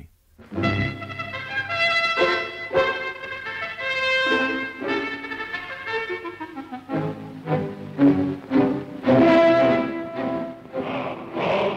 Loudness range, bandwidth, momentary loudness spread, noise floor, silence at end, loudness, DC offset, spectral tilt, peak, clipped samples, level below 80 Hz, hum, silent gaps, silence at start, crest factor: 6 LU; 9.4 kHz; 13 LU; -49 dBFS; 0 s; -23 LUFS; under 0.1%; -6.5 dB/octave; -8 dBFS; under 0.1%; -54 dBFS; none; none; 0 s; 16 dB